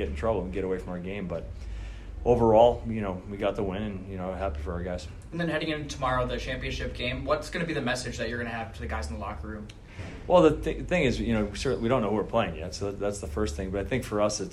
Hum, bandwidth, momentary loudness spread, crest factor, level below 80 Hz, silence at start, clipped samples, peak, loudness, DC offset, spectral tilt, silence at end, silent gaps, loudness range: none; 13.5 kHz; 14 LU; 22 dB; -40 dBFS; 0 s; under 0.1%; -6 dBFS; -28 LUFS; under 0.1%; -5.5 dB/octave; 0 s; none; 5 LU